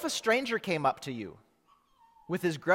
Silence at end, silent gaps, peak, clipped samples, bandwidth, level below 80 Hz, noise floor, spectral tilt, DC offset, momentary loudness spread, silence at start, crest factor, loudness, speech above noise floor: 0 s; none; -12 dBFS; under 0.1%; 16.5 kHz; -72 dBFS; -67 dBFS; -4 dB/octave; under 0.1%; 12 LU; 0 s; 20 dB; -31 LUFS; 37 dB